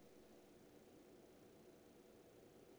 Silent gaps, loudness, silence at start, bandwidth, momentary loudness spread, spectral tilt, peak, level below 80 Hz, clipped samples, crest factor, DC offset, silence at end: none; -66 LUFS; 0 s; over 20 kHz; 1 LU; -5 dB/octave; -52 dBFS; -84 dBFS; under 0.1%; 12 dB; under 0.1%; 0 s